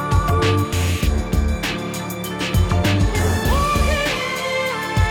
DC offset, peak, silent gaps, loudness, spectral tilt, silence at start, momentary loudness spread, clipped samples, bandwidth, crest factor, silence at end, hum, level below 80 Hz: under 0.1%; -6 dBFS; none; -20 LUFS; -5 dB/octave; 0 s; 6 LU; under 0.1%; 17.5 kHz; 12 dB; 0 s; none; -24 dBFS